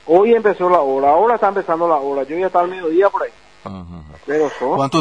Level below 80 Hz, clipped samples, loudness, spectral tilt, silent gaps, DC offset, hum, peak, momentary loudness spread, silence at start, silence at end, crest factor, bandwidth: -52 dBFS; under 0.1%; -16 LUFS; -6.5 dB/octave; none; 0.3%; none; -2 dBFS; 20 LU; 0.05 s; 0 s; 14 dB; 10 kHz